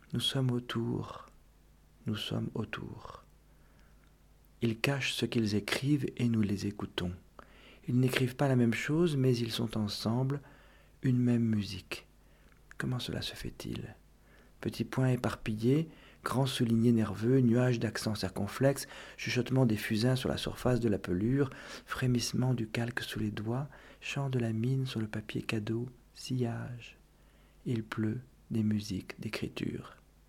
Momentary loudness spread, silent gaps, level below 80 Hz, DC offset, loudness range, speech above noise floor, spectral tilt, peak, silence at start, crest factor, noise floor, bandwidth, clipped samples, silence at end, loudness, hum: 14 LU; none; -58 dBFS; under 0.1%; 8 LU; 30 dB; -6 dB/octave; -12 dBFS; 0.1 s; 22 dB; -61 dBFS; 16 kHz; under 0.1%; 0.35 s; -33 LUFS; none